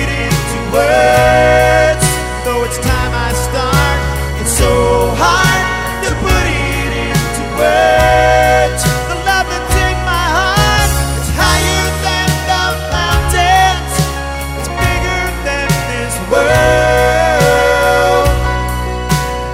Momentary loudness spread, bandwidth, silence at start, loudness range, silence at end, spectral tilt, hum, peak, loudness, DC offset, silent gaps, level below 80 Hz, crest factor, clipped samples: 7 LU; 16.5 kHz; 0 s; 2 LU; 0 s; -4 dB/octave; none; 0 dBFS; -12 LUFS; under 0.1%; none; -20 dBFS; 12 dB; under 0.1%